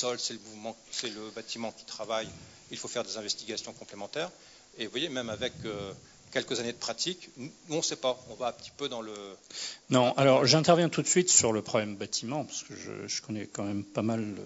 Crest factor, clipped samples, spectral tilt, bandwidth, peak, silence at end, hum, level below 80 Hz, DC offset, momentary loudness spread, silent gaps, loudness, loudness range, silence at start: 24 dB; under 0.1%; -3.5 dB/octave; 8 kHz; -6 dBFS; 0 s; none; -68 dBFS; under 0.1%; 19 LU; none; -30 LUFS; 11 LU; 0 s